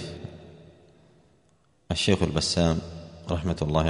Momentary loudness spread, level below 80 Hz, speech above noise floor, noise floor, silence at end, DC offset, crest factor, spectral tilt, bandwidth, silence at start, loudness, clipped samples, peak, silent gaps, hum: 18 LU; -42 dBFS; 40 dB; -65 dBFS; 0 s; under 0.1%; 22 dB; -5 dB/octave; 10.5 kHz; 0 s; -26 LUFS; under 0.1%; -6 dBFS; none; none